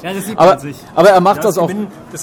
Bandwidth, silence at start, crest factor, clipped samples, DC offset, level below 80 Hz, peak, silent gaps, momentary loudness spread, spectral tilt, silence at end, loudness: 18.5 kHz; 0 s; 12 dB; 0.2%; under 0.1%; -52 dBFS; 0 dBFS; none; 13 LU; -5.5 dB/octave; 0 s; -12 LUFS